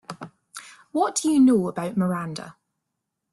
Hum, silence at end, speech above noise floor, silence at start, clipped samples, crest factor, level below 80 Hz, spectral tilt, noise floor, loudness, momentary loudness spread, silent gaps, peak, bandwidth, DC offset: none; 0.8 s; 59 dB; 0.1 s; under 0.1%; 14 dB; -66 dBFS; -5.5 dB/octave; -81 dBFS; -22 LUFS; 23 LU; none; -10 dBFS; 12.5 kHz; under 0.1%